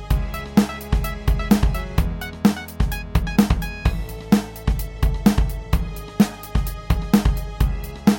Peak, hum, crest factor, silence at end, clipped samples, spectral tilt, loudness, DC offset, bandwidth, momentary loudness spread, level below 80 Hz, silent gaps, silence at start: -4 dBFS; none; 16 dB; 0 s; under 0.1%; -6.5 dB/octave; -22 LUFS; under 0.1%; 17.5 kHz; 7 LU; -24 dBFS; none; 0 s